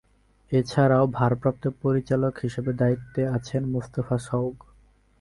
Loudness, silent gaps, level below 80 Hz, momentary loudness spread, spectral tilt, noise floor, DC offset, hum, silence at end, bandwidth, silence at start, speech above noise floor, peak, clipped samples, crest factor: -25 LUFS; none; -52 dBFS; 8 LU; -8 dB/octave; -58 dBFS; under 0.1%; none; 0.65 s; 11.5 kHz; 0.5 s; 34 dB; -6 dBFS; under 0.1%; 18 dB